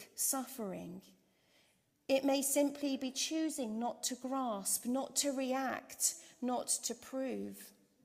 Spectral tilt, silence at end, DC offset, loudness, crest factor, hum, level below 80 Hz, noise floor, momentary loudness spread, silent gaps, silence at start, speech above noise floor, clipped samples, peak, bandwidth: -2 dB/octave; 0.35 s; under 0.1%; -36 LUFS; 20 dB; none; -82 dBFS; -73 dBFS; 12 LU; none; 0 s; 36 dB; under 0.1%; -18 dBFS; 16 kHz